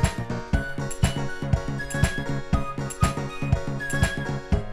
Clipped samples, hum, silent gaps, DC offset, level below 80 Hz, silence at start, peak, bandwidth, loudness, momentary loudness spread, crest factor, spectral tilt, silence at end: under 0.1%; none; none; under 0.1%; -32 dBFS; 0 s; -6 dBFS; 15.5 kHz; -27 LUFS; 5 LU; 20 dB; -5.5 dB/octave; 0 s